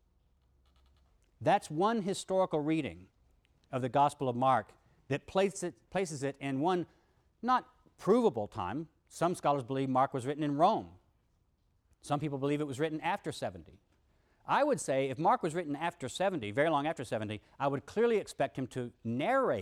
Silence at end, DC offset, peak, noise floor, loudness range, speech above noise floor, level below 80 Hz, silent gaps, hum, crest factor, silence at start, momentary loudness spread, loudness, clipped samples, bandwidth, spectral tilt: 0 s; under 0.1%; -16 dBFS; -73 dBFS; 2 LU; 41 dB; -68 dBFS; none; none; 18 dB; 1.4 s; 10 LU; -33 LUFS; under 0.1%; 14.5 kHz; -5.5 dB/octave